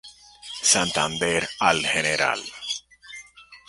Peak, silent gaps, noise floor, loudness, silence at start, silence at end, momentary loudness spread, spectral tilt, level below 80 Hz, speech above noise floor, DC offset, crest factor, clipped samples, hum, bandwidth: -2 dBFS; none; -47 dBFS; -22 LUFS; 0.05 s; 0.1 s; 22 LU; -1.5 dB/octave; -56 dBFS; 25 dB; under 0.1%; 24 dB; under 0.1%; none; 12 kHz